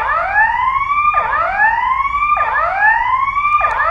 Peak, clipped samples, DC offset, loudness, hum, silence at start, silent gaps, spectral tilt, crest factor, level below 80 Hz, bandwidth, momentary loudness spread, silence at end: -2 dBFS; under 0.1%; under 0.1%; -14 LUFS; none; 0 s; none; -4 dB/octave; 14 dB; -38 dBFS; 7.8 kHz; 3 LU; 0 s